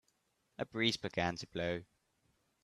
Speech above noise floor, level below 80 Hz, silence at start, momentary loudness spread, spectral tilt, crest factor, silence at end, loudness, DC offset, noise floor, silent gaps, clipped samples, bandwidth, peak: 41 dB; -70 dBFS; 0.6 s; 11 LU; -4.5 dB/octave; 24 dB; 0.8 s; -37 LUFS; under 0.1%; -79 dBFS; none; under 0.1%; 13.5 kHz; -18 dBFS